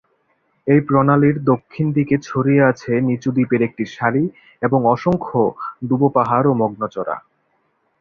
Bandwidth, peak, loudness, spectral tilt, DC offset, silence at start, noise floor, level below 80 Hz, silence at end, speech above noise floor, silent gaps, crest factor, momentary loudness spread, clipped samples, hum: 6.8 kHz; -2 dBFS; -18 LUFS; -9 dB/octave; under 0.1%; 0.65 s; -65 dBFS; -52 dBFS; 0.8 s; 48 dB; none; 16 dB; 10 LU; under 0.1%; none